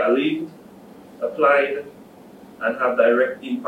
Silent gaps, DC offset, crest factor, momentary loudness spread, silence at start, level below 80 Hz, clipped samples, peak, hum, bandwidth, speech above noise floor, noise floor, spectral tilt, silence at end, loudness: none; under 0.1%; 18 dB; 14 LU; 0 s; -70 dBFS; under 0.1%; -2 dBFS; none; 14 kHz; 25 dB; -44 dBFS; -6 dB/octave; 0 s; -20 LUFS